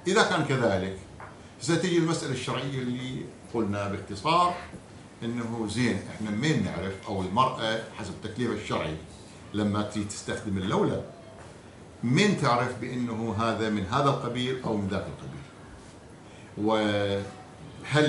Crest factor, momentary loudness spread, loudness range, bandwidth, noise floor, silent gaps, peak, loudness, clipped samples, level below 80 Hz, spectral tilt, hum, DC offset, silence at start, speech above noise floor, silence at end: 22 dB; 21 LU; 4 LU; 11.5 kHz; -48 dBFS; none; -6 dBFS; -28 LUFS; under 0.1%; -60 dBFS; -5.5 dB/octave; none; under 0.1%; 0 s; 20 dB; 0 s